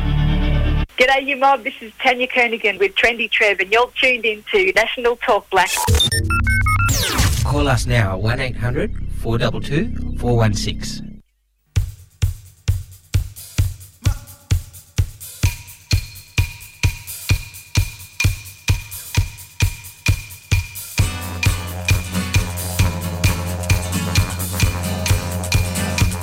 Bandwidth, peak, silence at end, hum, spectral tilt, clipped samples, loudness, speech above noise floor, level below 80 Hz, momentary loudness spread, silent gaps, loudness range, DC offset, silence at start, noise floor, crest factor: 16.5 kHz; -2 dBFS; 0 s; none; -4.5 dB/octave; under 0.1%; -19 LUFS; 46 dB; -26 dBFS; 10 LU; none; 8 LU; under 0.1%; 0 s; -63 dBFS; 16 dB